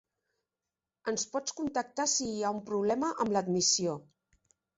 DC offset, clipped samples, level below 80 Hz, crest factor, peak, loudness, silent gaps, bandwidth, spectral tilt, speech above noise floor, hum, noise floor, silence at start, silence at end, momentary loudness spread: under 0.1%; under 0.1%; -70 dBFS; 18 dB; -16 dBFS; -31 LUFS; none; 8.2 kHz; -3 dB/octave; over 59 dB; none; under -90 dBFS; 1.05 s; 0.75 s; 9 LU